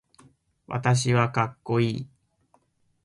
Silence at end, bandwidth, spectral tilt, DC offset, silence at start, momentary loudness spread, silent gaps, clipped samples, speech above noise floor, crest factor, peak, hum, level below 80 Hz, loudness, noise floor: 1 s; 11.5 kHz; -5.5 dB/octave; under 0.1%; 0.7 s; 13 LU; none; under 0.1%; 42 dB; 18 dB; -8 dBFS; none; -60 dBFS; -25 LUFS; -66 dBFS